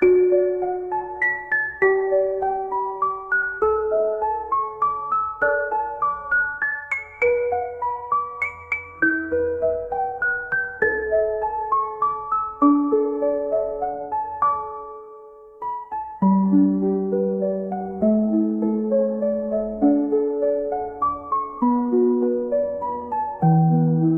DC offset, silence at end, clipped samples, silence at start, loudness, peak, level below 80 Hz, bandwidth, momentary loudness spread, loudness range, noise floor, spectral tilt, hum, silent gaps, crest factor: 0.1%; 0 s; under 0.1%; 0 s; -22 LUFS; -6 dBFS; -54 dBFS; 3.1 kHz; 8 LU; 2 LU; -43 dBFS; -11 dB/octave; none; none; 16 dB